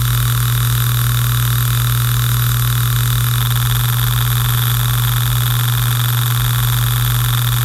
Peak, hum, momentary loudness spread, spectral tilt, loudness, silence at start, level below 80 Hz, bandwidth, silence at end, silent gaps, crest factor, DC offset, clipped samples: -2 dBFS; none; 0 LU; -3.5 dB/octave; -15 LUFS; 0 s; -28 dBFS; 16.5 kHz; 0 s; none; 14 dB; under 0.1%; under 0.1%